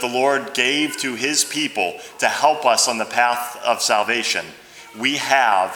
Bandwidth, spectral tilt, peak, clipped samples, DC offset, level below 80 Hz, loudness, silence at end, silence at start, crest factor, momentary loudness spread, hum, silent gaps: over 20 kHz; -1 dB/octave; 0 dBFS; under 0.1%; under 0.1%; -70 dBFS; -19 LUFS; 0 s; 0 s; 20 dB; 7 LU; none; none